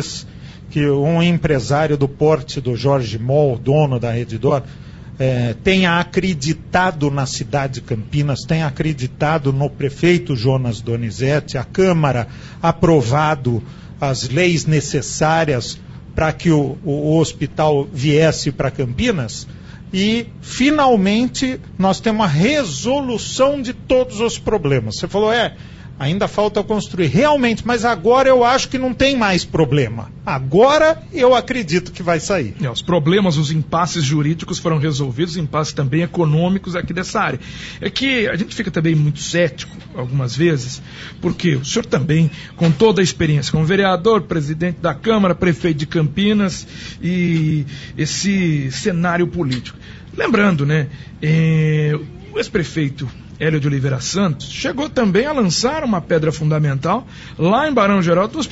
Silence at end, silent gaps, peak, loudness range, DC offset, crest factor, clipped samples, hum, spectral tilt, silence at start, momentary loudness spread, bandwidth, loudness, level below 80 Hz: 0 s; none; -2 dBFS; 3 LU; under 0.1%; 14 dB; under 0.1%; none; -5.5 dB/octave; 0 s; 9 LU; 8 kHz; -17 LUFS; -40 dBFS